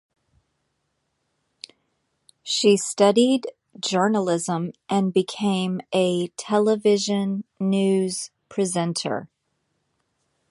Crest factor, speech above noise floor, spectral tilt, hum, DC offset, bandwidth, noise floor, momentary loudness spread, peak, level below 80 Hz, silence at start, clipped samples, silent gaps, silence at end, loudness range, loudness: 20 dB; 53 dB; -5 dB/octave; none; under 0.1%; 11.5 kHz; -74 dBFS; 13 LU; -4 dBFS; -70 dBFS; 2.45 s; under 0.1%; none; 1.25 s; 4 LU; -22 LUFS